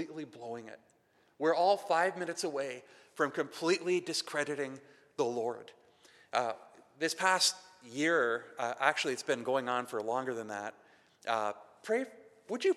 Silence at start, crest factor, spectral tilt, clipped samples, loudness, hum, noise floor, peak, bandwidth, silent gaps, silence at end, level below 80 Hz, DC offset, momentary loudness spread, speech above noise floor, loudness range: 0 s; 24 dB; -2.5 dB/octave; under 0.1%; -33 LUFS; none; -63 dBFS; -10 dBFS; 14.5 kHz; none; 0 s; under -90 dBFS; under 0.1%; 16 LU; 29 dB; 4 LU